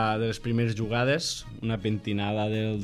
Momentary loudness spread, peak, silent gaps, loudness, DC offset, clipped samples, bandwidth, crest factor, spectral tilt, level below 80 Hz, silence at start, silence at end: 6 LU; -12 dBFS; none; -28 LUFS; under 0.1%; under 0.1%; 13.5 kHz; 14 dB; -5.5 dB/octave; -50 dBFS; 0 s; 0 s